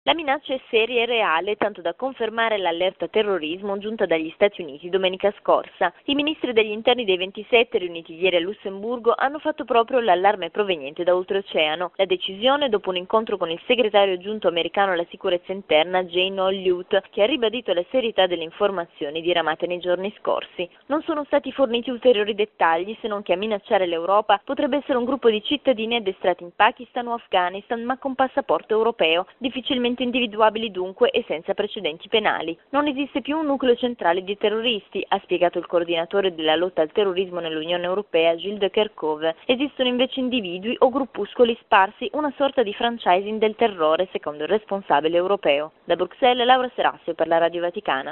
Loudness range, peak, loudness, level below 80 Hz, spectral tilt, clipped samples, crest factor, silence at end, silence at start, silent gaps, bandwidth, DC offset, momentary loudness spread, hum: 2 LU; -2 dBFS; -22 LUFS; -62 dBFS; -7 dB/octave; under 0.1%; 20 dB; 0 s; 0.05 s; none; 4.2 kHz; under 0.1%; 7 LU; none